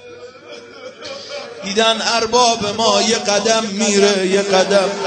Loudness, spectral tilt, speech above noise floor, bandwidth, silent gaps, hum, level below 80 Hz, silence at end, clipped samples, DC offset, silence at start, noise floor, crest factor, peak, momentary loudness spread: -14 LUFS; -2.5 dB/octave; 22 dB; 9.4 kHz; none; none; -56 dBFS; 0 s; under 0.1%; under 0.1%; 0 s; -37 dBFS; 16 dB; 0 dBFS; 20 LU